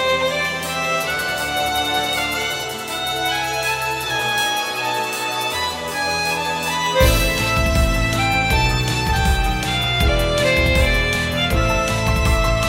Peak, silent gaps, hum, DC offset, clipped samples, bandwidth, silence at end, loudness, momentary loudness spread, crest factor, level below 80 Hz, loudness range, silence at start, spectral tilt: -2 dBFS; none; none; under 0.1%; under 0.1%; 16.5 kHz; 0 s; -19 LUFS; 5 LU; 16 dB; -26 dBFS; 3 LU; 0 s; -3.5 dB/octave